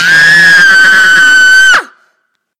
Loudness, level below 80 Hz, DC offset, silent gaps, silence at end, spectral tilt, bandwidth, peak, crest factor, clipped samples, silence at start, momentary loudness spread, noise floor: -2 LUFS; -46 dBFS; under 0.1%; none; 0.75 s; 0 dB/octave; 16 kHz; 0 dBFS; 6 dB; 2%; 0 s; 3 LU; -61 dBFS